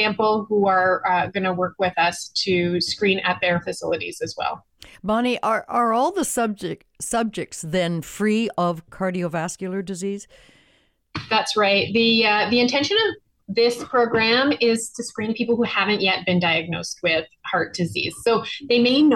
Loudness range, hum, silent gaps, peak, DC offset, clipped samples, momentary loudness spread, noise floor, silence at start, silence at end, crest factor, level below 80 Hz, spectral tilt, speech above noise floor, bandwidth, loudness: 6 LU; none; none; -10 dBFS; under 0.1%; under 0.1%; 11 LU; -61 dBFS; 0 s; 0 s; 12 dB; -58 dBFS; -4 dB/octave; 40 dB; 16.5 kHz; -21 LUFS